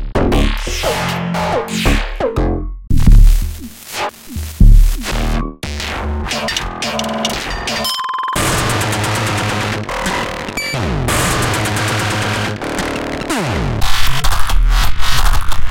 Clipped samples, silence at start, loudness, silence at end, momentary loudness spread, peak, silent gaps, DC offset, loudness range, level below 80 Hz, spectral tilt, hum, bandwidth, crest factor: under 0.1%; 0 s; -17 LUFS; 0 s; 7 LU; 0 dBFS; none; under 0.1%; 2 LU; -16 dBFS; -4 dB/octave; none; 17 kHz; 12 dB